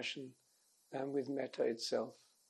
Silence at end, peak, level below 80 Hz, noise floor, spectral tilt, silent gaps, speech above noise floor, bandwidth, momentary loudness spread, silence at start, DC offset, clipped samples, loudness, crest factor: 0.35 s; -24 dBFS; under -90 dBFS; -74 dBFS; -4 dB/octave; none; 34 dB; 12 kHz; 11 LU; 0 s; under 0.1%; under 0.1%; -41 LUFS; 18 dB